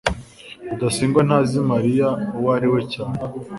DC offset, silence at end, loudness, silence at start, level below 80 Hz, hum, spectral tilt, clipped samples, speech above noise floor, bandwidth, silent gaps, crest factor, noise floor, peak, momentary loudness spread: under 0.1%; 0 s; -20 LUFS; 0.05 s; -44 dBFS; none; -6.5 dB/octave; under 0.1%; 20 dB; 11.5 kHz; none; 18 dB; -39 dBFS; -2 dBFS; 14 LU